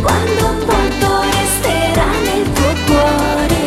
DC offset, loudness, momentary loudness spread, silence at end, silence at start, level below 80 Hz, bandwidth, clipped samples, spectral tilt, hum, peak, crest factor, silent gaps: under 0.1%; -14 LUFS; 2 LU; 0 s; 0 s; -24 dBFS; 16.5 kHz; under 0.1%; -4.5 dB/octave; none; 0 dBFS; 14 dB; none